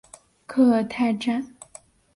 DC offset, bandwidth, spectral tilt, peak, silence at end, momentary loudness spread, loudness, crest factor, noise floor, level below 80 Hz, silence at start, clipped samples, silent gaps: under 0.1%; 11.5 kHz; -5.5 dB/octave; -8 dBFS; 0.7 s; 17 LU; -23 LUFS; 16 dB; -50 dBFS; -62 dBFS; 0.5 s; under 0.1%; none